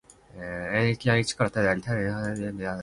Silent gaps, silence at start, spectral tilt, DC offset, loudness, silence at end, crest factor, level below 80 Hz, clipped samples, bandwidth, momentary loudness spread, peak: none; 0.35 s; -5.5 dB/octave; under 0.1%; -27 LUFS; 0 s; 20 dB; -52 dBFS; under 0.1%; 11.5 kHz; 10 LU; -8 dBFS